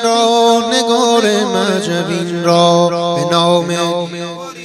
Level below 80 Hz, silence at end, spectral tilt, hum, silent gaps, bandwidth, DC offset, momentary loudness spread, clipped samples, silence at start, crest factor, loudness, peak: -60 dBFS; 0 s; -4.5 dB/octave; none; none; 14.5 kHz; under 0.1%; 8 LU; under 0.1%; 0 s; 14 dB; -13 LUFS; 0 dBFS